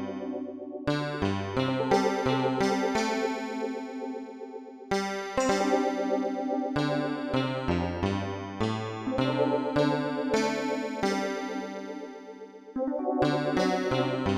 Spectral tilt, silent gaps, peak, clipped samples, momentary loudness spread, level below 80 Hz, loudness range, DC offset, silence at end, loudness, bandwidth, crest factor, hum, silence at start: -5.5 dB/octave; none; -8 dBFS; under 0.1%; 11 LU; -54 dBFS; 2 LU; under 0.1%; 0 s; -29 LUFS; 13.5 kHz; 22 dB; none; 0 s